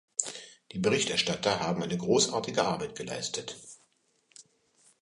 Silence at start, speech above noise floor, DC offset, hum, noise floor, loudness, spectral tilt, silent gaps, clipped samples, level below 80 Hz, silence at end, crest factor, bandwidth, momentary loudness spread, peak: 0.2 s; 41 dB; under 0.1%; none; -70 dBFS; -29 LUFS; -3 dB/octave; none; under 0.1%; -66 dBFS; 0.65 s; 24 dB; 11.5 kHz; 16 LU; -6 dBFS